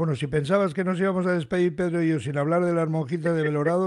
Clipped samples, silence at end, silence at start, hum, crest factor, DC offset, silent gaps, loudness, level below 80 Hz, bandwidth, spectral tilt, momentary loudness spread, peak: under 0.1%; 0 s; 0 s; none; 14 dB; under 0.1%; none; -24 LUFS; -58 dBFS; 11 kHz; -7.5 dB/octave; 3 LU; -10 dBFS